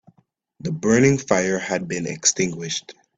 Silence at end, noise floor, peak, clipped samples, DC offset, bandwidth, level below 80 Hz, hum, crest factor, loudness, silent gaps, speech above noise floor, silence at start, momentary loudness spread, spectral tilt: 0.25 s; -63 dBFS; -2 dBFS; under 0.1%; under 0.1%; 9.2 kHz; -56 dBFS; none; 20 dB; -21 LUFS; none; 43 dB; 0.65 s; 12 LU; -4 dB/octave